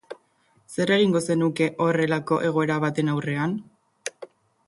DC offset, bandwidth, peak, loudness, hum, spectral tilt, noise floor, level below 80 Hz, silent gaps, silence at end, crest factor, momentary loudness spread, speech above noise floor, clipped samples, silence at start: under 0.1%; 11.5 kHz; -8 dBFS; -23 LUFS; none; -6 dB/octave; -64 dBFS; -66 dBFS; none; 0.4 s; 16 dB; 16 LU; 41 dB; under 0.1%; 0.1 s